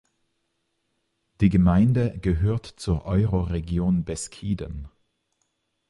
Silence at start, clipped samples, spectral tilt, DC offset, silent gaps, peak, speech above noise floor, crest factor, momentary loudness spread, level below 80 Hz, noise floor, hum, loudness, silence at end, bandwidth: 1.4 s; under 0.1%; -7.5 dB/octave; under 0.1%; none; -6 dBFS; 52 dB; 18 dB; 12 LU; -36 dBFS; -75 dBFS; none; -24 LUFS; 1 s; 11.5 kHz